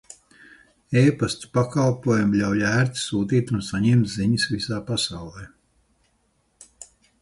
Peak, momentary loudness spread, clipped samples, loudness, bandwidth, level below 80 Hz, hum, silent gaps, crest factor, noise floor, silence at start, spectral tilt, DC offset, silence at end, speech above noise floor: -6 dBFS; 9 LU; under 0.1%; -22 LUFS; 11.5 kHz; -52 dBFS; none; none; 18 dB; -67 dBFS; 0.9 s; -5.5 dB/octave; under 0.1%; 0.35 s; 46 dB